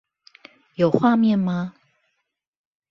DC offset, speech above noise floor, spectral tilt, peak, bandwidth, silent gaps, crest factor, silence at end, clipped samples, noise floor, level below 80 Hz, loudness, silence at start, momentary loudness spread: under 0.1%; 58 dB; -9 dB/octave; -2 dBFS; 6.2 kHz; none; 22 dB; 1.2 s; under 0.1%; -77 dBFS; -66 dBFS; -20 LUFS; 0.8 s; 15 LU